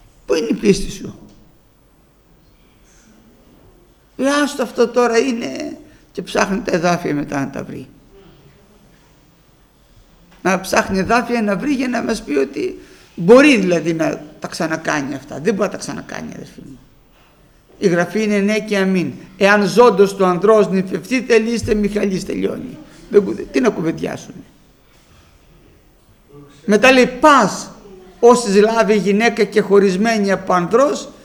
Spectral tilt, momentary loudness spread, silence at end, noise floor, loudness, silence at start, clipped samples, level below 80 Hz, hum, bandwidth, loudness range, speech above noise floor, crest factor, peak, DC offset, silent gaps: -5 dB/octave; 18 LU; 0.15 s; -52 dBFS; -16 LUFS; 0.3 s; under 0.1%; -44 dBFS; none; 19 kHz; 10 LU; 37 dB; 18 dB; 0 dBFS; under 0.1%; none